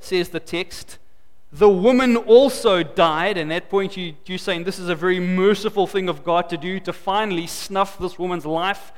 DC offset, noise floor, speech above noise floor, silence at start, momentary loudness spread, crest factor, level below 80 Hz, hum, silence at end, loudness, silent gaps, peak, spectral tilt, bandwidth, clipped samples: 1%; -55 dBFS; 36 dB; 0.05 s; 13 LU; 18 dB; -50 dBFS; none; 0.15 s; -20 LUFS; none; -2 dBFS; -5 dB/octave; 17 kHz; under 0.1%